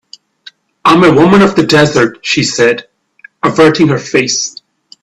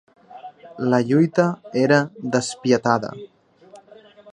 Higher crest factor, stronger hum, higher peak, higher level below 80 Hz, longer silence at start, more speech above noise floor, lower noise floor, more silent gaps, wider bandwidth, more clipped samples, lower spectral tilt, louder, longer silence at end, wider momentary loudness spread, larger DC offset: second, 10 dB vs 20 dB; neither; about the same, 0 dBFS vs -2 dBFS; first, -46 dBFS vs -66 dBFS; first, 0.85 s vs 0.3 s; first, 33 dB vs 29 dB; second, -41 dBFS vs -48 dBFS; neither; first, 12 kHz vs 10.5 kHz; neither; second, -4.5 dB/octave vs -6 dB/octave; first, -9 LUFS vs -20 LUFS; first, 0.5 s vs 0.05 s; second, 8 LU vs 23 LU; neither